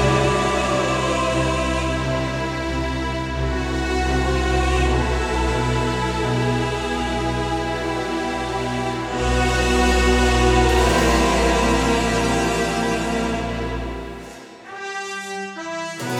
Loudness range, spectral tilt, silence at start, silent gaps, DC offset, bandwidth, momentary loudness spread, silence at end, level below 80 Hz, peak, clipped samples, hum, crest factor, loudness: 5 LU; -5 dB/octave; 0 s; none; under 0.1%; 15 kHz; 11 LU; 0 s; -28 dBFS; -4 dBFS; under 0.1%; none; 16 dB; -21 LUFS